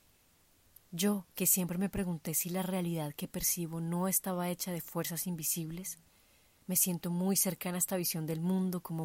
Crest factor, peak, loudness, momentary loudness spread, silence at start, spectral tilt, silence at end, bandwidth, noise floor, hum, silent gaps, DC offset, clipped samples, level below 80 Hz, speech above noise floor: 20 dB; -14 dBFS; -33 LUFS; 8 LU; 0.9 s; -4 dB/octave; 0 s; 16 kHz; -67 dBFS; none; none; under 0.1%; under 0.1%; -62 dBFS; 33 dB